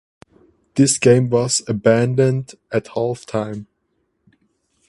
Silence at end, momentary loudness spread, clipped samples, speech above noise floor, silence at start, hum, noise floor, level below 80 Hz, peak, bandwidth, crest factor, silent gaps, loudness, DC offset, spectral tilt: 1.25 s; 12 LU; under 0.1%; 52 dB; 0.75 s; none; -69 dBFS; -56 dBFS; 0 dBFS; 11.5 kHz; 18 dB; none; -18 LUFS; under 0.1%; -5 dB/octave